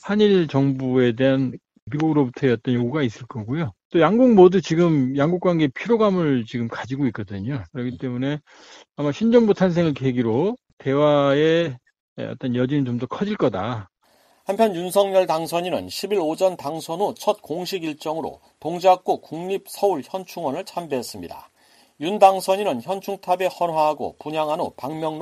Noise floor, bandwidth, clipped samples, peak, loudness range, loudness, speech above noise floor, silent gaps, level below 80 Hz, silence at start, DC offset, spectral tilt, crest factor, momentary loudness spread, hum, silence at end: -59 dBFS; 15 kHz; under 0.1%; -2 dBFS; 6 LU; -21 LUFS; 39 dB; 1.82-1.87 s, 3.85-3.90 s, 10.73-10.77 s, 12.00-12.16 s; -58 dBFS; 0.05 s; under 0.1%; -6.5 dB/octave; 20 dB; 12 LU; none; 0 s